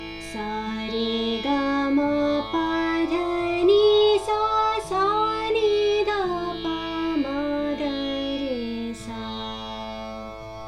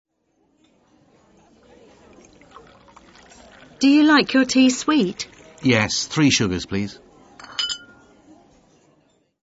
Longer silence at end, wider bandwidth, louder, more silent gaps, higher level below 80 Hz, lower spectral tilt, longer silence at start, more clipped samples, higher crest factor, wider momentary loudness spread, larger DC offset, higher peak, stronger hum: second, 0 s vs 1.65 s; first, 11.5 kHz vs 8 kHz; second, -24 LUFS vs -19 LUFS; neither; about the same, -48 dBFS vs -52 dBFS; about the same, -5 dB/octave vs -4 dB/octave; second, 0 s vs 3.8 s; neither; about the same, 16 dB vs 20 dB; second, 13 LU vs 16 LU; neither; second, -8 dBFS vs -2 dBFS; first, 50 Hz at -45 dBFS vs none